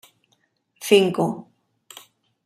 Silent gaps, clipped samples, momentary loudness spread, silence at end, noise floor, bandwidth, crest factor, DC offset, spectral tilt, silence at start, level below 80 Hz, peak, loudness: none; under 0.1%; 27 LU; 1.05 s; -68 dBFS; 15.5 kHz; 22 dB; under 0.1%; -5 dB/octave; 0.8 s; -70 dBFS; -2 dBFS; -19 LUFS